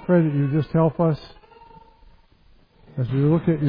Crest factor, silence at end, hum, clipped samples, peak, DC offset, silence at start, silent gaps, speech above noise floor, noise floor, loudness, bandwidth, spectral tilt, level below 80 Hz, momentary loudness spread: 16 dB; 0 s; none; under 0.1%; -6 dBFS; under 0.1%; 0 s; none; 35 dB; -55 dBFS; -21 LUFS; 5.2 kHz; -11.5 dB/octave; -50 dBFS; 11 LU